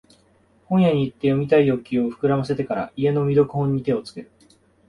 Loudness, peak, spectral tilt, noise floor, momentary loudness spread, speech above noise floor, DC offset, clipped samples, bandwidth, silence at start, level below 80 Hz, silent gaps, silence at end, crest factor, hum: -21 LUFS; -4 dBFS; -9 dB/octave; -58 dBFS; 8 LU; 38 dB; under 0.1%; under 0.1%; 11 kHz; 0.7 s; -54 dBFS; none; 0.65 s; 16 dB; none